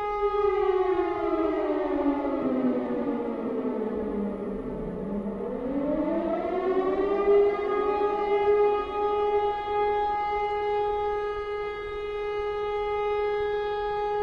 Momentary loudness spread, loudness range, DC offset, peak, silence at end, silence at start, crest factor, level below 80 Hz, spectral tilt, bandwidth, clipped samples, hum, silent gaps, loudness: 8 LU; 5 LU; under 0.1%; -12 dBFS; 0 s; 0 s; 14 dB; -48 dBFS; -7.5 dB/octave; 5.6 kHz; under 0.1%; none; none; -27 LUFS